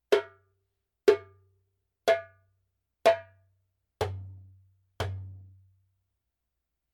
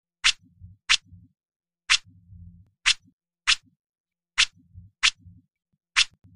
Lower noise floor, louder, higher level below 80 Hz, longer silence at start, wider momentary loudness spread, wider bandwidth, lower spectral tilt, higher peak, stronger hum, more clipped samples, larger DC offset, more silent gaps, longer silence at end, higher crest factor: first, -84 dBFS vs -54 dBFS; second, -29 LUFS vs -23 LUFS; second, -62 dBFS vs -50 dBFS; second, 0.1 s vs 0.25 s; first, 18 LU vs 5 LU; about the same, 16.5 kHz vs 15.5 kHz; first, -5 dB/octave vs 2.5 dB/octave; second, -8 dBFS vs -2 dBFS; neither; neither; neither; second, none vs 1.56-1.60 s, 3.13-3.19 s, 3.79-3.93 s, 4.00-4.04 s; first, 1.55 s vs 0.3 s; about the same, 24 dB vs 28 dB